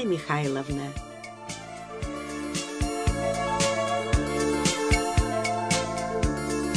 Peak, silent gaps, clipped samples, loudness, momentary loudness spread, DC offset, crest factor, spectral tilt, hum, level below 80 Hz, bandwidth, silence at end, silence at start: -8 dBFS; none; under 0.1%; -27 LUFS; 13 LU; under 0.1%; 18 dB; -4.5 dB/octave; none; -36 dBFS; 11 kHz; 0 s; 0 s